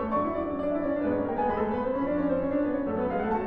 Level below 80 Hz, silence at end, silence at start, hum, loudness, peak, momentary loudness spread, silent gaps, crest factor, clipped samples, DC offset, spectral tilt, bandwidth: -48 dBFS; 0 s; 0 s; none; -28 LUFS; -16 dBFS; 2 LU; none; 12 dB; under 0.1%; under 0.1%; -10 dB/octave; 4.5 kHz